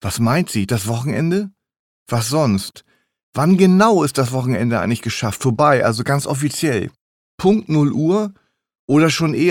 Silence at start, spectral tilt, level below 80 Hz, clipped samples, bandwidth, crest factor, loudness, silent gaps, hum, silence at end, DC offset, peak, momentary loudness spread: 0.05 s; -6 dB/octave; -52 dBFS; under 0.1%; 18 kHz; 16 dB; -17 LUFS; 1.79-2.06 s, 3.23-3.33 s, 7.01-7.38 s, 8.79-8.88 s; none; 0 s; under 0.1%; -2 dBFS; 9 LU